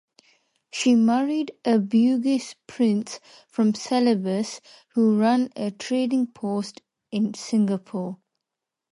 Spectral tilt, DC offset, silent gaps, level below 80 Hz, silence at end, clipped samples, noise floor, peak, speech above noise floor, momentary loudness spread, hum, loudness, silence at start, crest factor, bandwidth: -5.5 dB/octave; under 0.1%; none; -74 dBFS; 0.75 s; under 0.1%; -85 dBFS; -8 dBFS; 63 dB; 15 LU; none; -23 LUFS; 0.75 s; 14 dB; 11.5 kHz